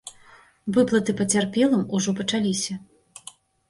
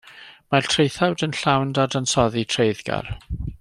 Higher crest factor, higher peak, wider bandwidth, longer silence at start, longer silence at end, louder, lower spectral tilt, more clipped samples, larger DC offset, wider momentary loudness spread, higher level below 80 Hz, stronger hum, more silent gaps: about the same, 16 dB vs 20 dB; second, -8 dBFS vs -2 dBFS; about the same, 11.5 kHz vs 12.5 kHz; about the same, 0.05 s vs 0.05 s; first, 0.85 s vs 0.05 s; about the same, -23 LUFS vs -21 LUFS; about the same, -4.5 dB/octave vs -4.5 dB/octave; neither; neither; first, 22 LU vs 10 LU; second, -60 dBFS vs -42 dBFS; neither; neither